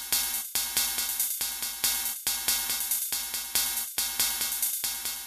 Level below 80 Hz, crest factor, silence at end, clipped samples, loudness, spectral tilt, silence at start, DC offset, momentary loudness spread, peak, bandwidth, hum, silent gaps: -58 dBFS; 24 dB; 0 s; under 0.1%; -27 LUFS; 2 dB/octave; 0 s; under 0.1%; 3 LU; -6 dBFS; 14.5 kHz; none; none